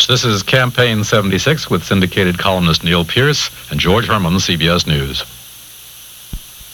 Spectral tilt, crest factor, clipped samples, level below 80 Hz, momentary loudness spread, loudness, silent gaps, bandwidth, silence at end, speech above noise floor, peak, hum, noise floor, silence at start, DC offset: -4.5 dB/octave; 14 dB; under 0.1%; -34 dBFS; 20 LU; -14 LUFS; none; 19.5 kHz; 0 s; 22 dB; 0 dBFS; none; -36 dBFS; 0 s; under 0.1%